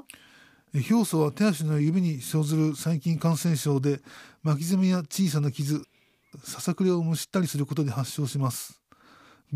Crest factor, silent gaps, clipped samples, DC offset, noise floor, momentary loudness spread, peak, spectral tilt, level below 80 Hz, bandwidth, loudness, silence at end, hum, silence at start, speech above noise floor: 14 dB; none; under 0.1%; under 0.1%; -56 dBFS; 8 LU; -12 dBFS; -6 dB/octave; -70 dBFS; 15.5 kHz; -26 LUFS; 0 s; none; 0.75 s; 31 dB